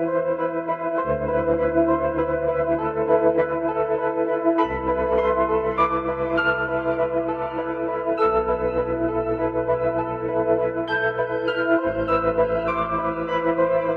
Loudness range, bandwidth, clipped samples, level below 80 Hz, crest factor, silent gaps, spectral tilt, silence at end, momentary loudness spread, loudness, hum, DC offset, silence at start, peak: 2 LU; 5 kHz; under 0.1%; -44 dBFS; 16 dB; none; -8.5 dB/octave; 0 s; 4 LU; -22 LUFS; none; under 0.1%; 0 s; -6 dBFS